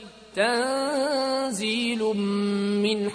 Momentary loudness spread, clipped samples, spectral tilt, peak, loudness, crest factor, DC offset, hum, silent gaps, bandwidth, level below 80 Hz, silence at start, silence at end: 2 LU; under 0.1%; -4.5 dB/octave; -12 dBFS; -25 LUFS; 14 dB; under 0.1%; none; none; 11 kHz; -64 dBFS; 0 s; 0 s